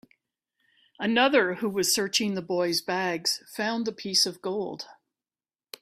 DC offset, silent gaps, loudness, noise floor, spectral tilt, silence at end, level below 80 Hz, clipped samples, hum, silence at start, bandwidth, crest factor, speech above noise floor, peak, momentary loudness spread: under 0.1%; none; -26 LUFS; under -90 dBFS; -2.5 dB/octave; 0.9 s; -72 dBFS; under 0.1%; none; 1 s; 15.5 kHz; 22 dB; over 63 dB; -6 dBFS; 11 LU